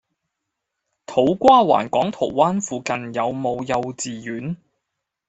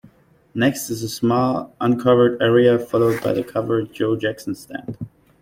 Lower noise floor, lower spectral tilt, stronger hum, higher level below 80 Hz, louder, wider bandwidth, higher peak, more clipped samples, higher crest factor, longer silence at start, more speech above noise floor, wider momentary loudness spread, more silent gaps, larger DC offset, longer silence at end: first, -80 dBFS vs -51 dBFS; about the same, -5 dB/octave vs -6 dB/octave; neither; about the same, -58 dBFS vs -56 dBFS; about the same, -20 LUFS vs -19 LUFS; second, 8.2 kHz vs 16.5 kHz; about the same, 0 dBFS vs -2 dBFS; neither; about the same, 20 dB vs 16 dB; first, 1.1 s vs 0.55 s; first, 61 dB vs 32 dB; about the same, 15 LU vs 16 LU; neither; neither; first, 0.75 s vs 0.35 s